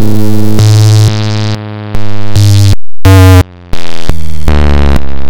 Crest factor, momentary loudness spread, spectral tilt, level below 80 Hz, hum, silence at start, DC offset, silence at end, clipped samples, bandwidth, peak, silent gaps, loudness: 4 dB; 14 LU; -6 dB/octave; -16 dBFS; none; 0 s; under 0.1%; 0 s; 30%; 17 kHz; 0 dBFS; none; -8 LUFS